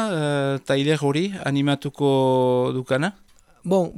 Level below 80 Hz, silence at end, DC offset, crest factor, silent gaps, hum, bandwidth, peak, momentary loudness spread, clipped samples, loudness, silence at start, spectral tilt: -60 dBFS; 0 s; under 0.1%; 14 dB; none; none; 12.5 kHz; -8 dBFS; 5 LU; under 0.1%; -22 LUFS; 0 s; -6.5 dB/octave